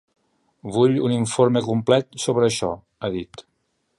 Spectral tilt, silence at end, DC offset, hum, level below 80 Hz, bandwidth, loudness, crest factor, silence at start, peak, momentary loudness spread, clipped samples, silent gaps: -5.5 dB/octave; 0.55 s; under 0.1%; none; -56 dBFS; 11.5 kHz; -21 LUFS; 20 dB; 0.65 s; -2 dBFS; 11 LU; under 0.1%; none